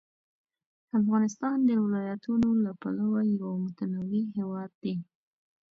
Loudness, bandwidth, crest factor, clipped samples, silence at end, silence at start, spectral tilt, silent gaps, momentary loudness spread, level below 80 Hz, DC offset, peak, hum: -29 LUFS; 7 kHz; 14 dB; under 0.1%; 0.7 s; 0.95 s; -8 dB/octave; 4.75-4.81 s; 10 LU; -64 dBFS; under 0.1%; -16 dBFS; none